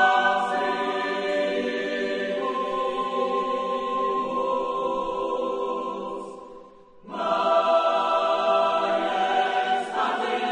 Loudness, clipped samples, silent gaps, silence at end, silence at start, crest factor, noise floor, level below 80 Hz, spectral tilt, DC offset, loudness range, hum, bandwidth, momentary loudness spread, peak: -25 LUFS; under 0.1%; none; 0 s; 0 s; 16 dB; -48 dBFS; -62 dBFS; -4 dB/octave; under 0.1%; 5 LU; none; 10 kHz; 8 LU; -8 dBFS